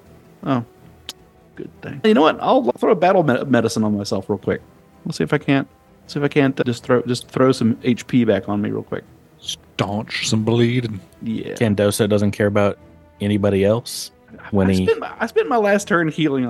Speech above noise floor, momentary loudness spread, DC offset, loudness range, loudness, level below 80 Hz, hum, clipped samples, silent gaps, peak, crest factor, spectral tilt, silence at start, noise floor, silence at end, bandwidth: 22 dB; 15 LU; under 0.1%; 3 LU; -19 LUFS; -56 dBFS; none; under 0.1%; none; 0 dBFS; 18 dB; -6 dB/octave; 0.4 s; -40 dBFS; 0 s; 12.5 kHz